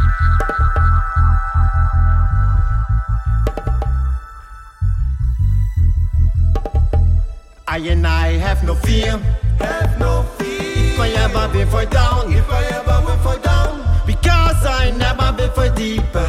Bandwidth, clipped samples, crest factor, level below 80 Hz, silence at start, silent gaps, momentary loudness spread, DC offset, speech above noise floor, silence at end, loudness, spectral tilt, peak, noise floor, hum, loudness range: 14 kHz; under 0.1%; 12 dB; -16 dBFS; 0 s; none; 5 LU; under 0.1%; 20 dB; 0 s; -17 LUFS; -6 dB/octave; -2 dBFS; -35 dBFS; none; 3 LU